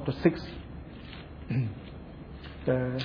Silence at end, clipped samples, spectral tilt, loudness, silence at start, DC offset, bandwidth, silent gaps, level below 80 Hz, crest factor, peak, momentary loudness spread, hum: 0 s; under 0.1%; -9 dB/octave; -31 LUFS; 0 s; under 0.1%; 5.4 kHz; none; -48 dBFS; 24 dB; -8 dBFS; 17 LU; none